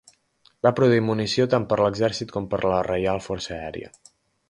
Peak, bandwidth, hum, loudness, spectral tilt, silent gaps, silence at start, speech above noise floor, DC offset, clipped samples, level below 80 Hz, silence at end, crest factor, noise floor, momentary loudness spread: -4 dBFS; 11.5 kHz; none; -23 LUFS; -6 dB/octave; none; 0.65 s; 39 dB; under 0.1%; under 0.1%; -50 dBFS; 0.6 s; 20 dB; -62 dBFS; 12 LU